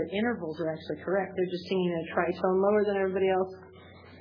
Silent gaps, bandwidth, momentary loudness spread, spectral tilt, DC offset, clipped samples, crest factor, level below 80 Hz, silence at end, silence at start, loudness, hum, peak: none; 5.4 kHz; 9 LU; -8.5 dB/octave; under 0.1%; under 0.1%; 18 dB; -66 dBFS; 0 s; 0 s; -29 LUFS; none; -12 dBFS